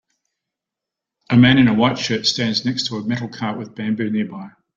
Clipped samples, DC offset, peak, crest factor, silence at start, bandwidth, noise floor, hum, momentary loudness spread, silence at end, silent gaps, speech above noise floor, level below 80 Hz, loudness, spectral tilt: under 0.1%; under 0.1%; -2 dBFS; 18 dB; 1.3 s; 7.6 kHz; -85 dBFS; none; 13 LU; 0.3 s; none; 67 dB; -52 dBFS; -18 LUFS; -5.5 dB/octave